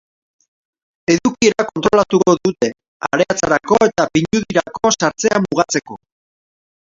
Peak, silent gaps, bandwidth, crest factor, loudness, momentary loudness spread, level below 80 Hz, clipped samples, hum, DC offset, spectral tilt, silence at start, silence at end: 0 dBFS; 2.88-3.00 s; 7.8 kHz; 16 dB; -16 LUFS; 7 LU; -50 dBFS; under 0.1%; none; under 0.1%; -4 dB/octave; 1.1 s; 0.9 s